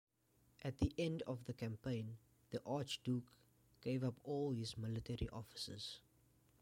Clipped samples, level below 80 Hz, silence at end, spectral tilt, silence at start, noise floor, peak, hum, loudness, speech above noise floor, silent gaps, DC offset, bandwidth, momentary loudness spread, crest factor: under 0.1%; -60 dBFS; 0.6 s; -6 dB/octave; 0.6 s; -76 dBFS; -26 dBFS; none; -45 LUFS; 32 dB; none; under 0.1%; 16.5 kHz; 8 LU; 20 dB